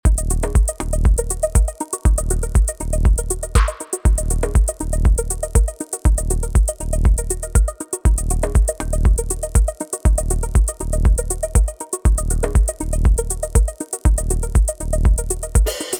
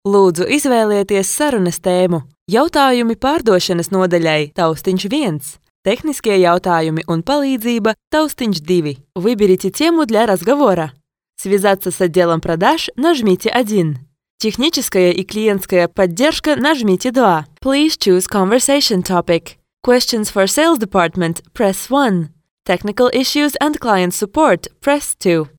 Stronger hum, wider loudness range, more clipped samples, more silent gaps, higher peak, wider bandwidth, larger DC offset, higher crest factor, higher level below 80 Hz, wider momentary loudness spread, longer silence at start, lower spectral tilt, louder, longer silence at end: neither; about the same, 0 LU vs 2 LU; neither; second, none vs 2.41-2.46 s, 5.70-5.83 s, 8.07-8.11 s, 14.30-14.38 s, 22.51-22.57 s; about the same, 0 dBFS vs 0 dBFS; second, 17.5 kHz vs over 20 kHz; neither; about the same, 16 dB vs 14 dB; first, -18 dBFS vs -46 dBFS; second, 3 LU vs 6 LU; about the same, 0.05 s vs 0.05 s; about the same, -5.5 dB/octave vs -4.5 dB/octave; second, -20 LUFS vs -15 LUFS; about the same, 0 s vs 0.1 s